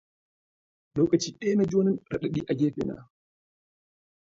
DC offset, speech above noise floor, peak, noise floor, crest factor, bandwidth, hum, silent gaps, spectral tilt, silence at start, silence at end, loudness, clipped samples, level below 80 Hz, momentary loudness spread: under 0.1%; over 64 dB; -10 dBFS; under -90 dBFS; 20 dB; 7.8 kHz; none; none; -6.5 dB/octave; 0.95 s; 1.25 s; -27 LUFS; under 0.1%; -60 dBFS; 10 LU